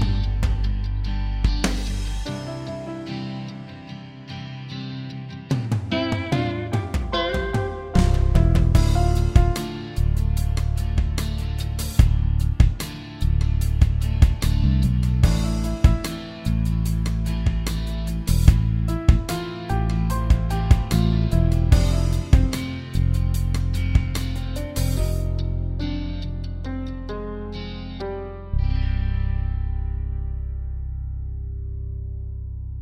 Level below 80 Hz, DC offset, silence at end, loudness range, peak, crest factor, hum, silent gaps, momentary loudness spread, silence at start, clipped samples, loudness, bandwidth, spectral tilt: -24 dBFS; under 0.1%; 0 s; 8 LU; 0 dBFS; 20 dB; none; none; 13 LU; 0 s; under 0.1%; -24 LUFS; 16 kHz; -6.5 dB/octave